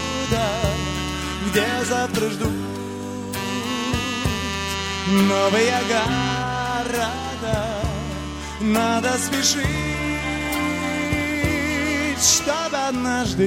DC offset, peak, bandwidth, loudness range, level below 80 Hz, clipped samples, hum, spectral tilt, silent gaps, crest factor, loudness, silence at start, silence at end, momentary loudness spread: under 0.1%; -4 dBFS; 16.5 kHz; 3 LU; -36 dBFS; under 0.1%; none; -3.5 dB/octave; none; 18 dB; -22 LUFS; 0 s; 0 s; 8 LU